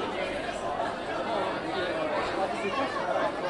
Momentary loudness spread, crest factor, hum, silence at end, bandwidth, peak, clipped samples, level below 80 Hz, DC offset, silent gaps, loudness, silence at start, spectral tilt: 3 LU; 14 dB; none; 0 s; 11.5 kHz; -16 dBFS; under 0.1%; -56 dBFS; under 0.1%; none; -30 LUFS; 0 s; -4.5 dB/octave